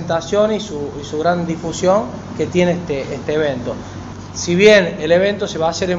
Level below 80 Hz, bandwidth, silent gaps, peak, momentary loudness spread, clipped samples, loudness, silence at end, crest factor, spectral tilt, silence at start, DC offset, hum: -44 dBFS; 8 kHz; none; 0 dBFS; 14 LU; under 0.1%; -17 LUFS; 0 s; 16 dB; -4.5 dB/octave; 0 s; under 0.1%; none